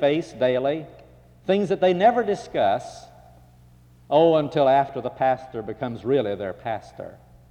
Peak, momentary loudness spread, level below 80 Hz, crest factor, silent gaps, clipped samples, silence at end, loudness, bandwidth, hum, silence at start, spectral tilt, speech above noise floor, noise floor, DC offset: -8 dBFS; 16 LU; -58 dBFS; 16 dB; none; under 0.1%; 0.4 s; -23 LUFS; 10 kHz; none; 0 s; -6.5 dB/octave; 30 dB; -52 dBFS; under 0.1%